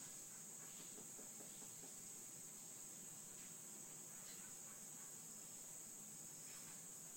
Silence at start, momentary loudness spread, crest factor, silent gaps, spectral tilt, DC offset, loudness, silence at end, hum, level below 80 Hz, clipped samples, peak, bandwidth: 0 s; 1 LU; 14 dB; none; -1.5 dB/octave; under 0.1%; -53 LUFS; 0 s; none; -86 dBFS; under 0.1%; -42 dBFS; 16.5 kHz